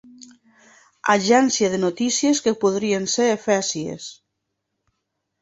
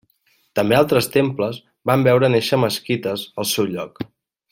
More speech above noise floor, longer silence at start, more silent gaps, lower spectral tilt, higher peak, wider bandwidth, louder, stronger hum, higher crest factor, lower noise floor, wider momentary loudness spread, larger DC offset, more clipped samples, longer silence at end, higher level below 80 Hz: first, 58 dB vs 44 dB; first, 1.05 s vs 0.55 s; neither; second, -3.5 dB/octave vs -5 dB/octave; about the same, -2 dBFS vs 0 dBFS; second, 8 kHz vs 16.5 kHz; about the same, -20 LUFS vs -19 LUFS; neither; about the same, 20 dB vs 18 dB; first, -78 dBFS vs -63 dBFS; about the same, 11 LU vs 12 LU; neither; neither; first, 1.3 s vs 0.45 s; second, -64 dBFS vs -56 dBFS